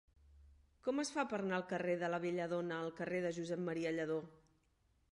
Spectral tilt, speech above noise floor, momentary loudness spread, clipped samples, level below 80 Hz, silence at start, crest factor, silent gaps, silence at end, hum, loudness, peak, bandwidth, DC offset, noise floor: -5.5 dB/octave; 37 dB; 4 LU; under 0.1%; -72 dBFS; 0.3 s; 18 dB; none; 0.8 s; none; -40 LUFS; -22 dBFS; 11 kHz; under 0.1%; -77 dBFS